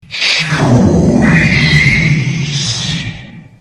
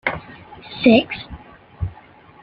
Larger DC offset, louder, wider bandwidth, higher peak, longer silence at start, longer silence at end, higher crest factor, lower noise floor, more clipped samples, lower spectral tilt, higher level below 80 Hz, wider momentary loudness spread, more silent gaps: neither; first, -10 LUFS vs -19 LUFS; first, 11.5 kHz vs 5.4 kHz; about the same, 0 dBFS vs -2 dBFS; about the same, 0.1 s vs 0.05 s; second, 0.15 s vs 0.55 s; second, 12 dB vs 20 dB; second, -31 dBFS vs -46 dBFS; neither; second, -5 dB/octave vs -9 dB/octave; first, -28 dBFS vs -42 dBFS; second, 9 LU vs 25 LU; neither